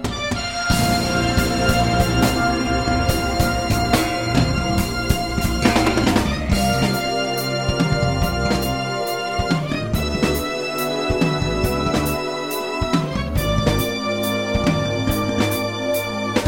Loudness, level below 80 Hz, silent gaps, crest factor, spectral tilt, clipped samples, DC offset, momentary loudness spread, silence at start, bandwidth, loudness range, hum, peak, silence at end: -20 LUFS; -30 dBFS; none; 20 dB; -5 dB/octave; under 0.1%; 0.3%; 5 LU; 0 s; 17 kHz; 3 LU; none; 0 dBFS; 0 s